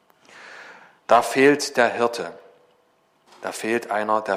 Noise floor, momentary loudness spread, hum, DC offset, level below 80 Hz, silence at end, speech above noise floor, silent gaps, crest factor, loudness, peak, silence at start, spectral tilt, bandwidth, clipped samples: -63 dBFS; 24 LU; none; under 0.1%; -70 dBFS; 0 s; 42 dB; none; 22 dB; -21 LUFS; -2 dBFS; 0.35 s; -3.5 dB/octave; 15.5 kHz; under 0.1%